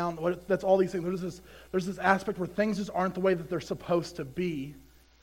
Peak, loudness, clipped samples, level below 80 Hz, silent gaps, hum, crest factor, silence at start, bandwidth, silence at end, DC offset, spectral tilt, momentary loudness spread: -8 dBFS; -30 LUFS; under 0.1%; -58 dBFS; none; none; 22 dB; 0 s; 16 kHz; 0.4 s; under 0.1%; -6.5 dB/octave; 11 LU